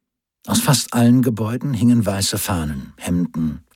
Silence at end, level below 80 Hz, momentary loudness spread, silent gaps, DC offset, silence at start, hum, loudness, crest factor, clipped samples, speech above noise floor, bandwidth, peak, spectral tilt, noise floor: 0.15 s; -42 dBFS; 9 LU; none; under 0.1%; 0.45 s; none; -18 LUFS; 16 dB; under 0.1%; 21 dB; 17 kHz; -4 dBFS; -5 dB/octave; -39 dBFS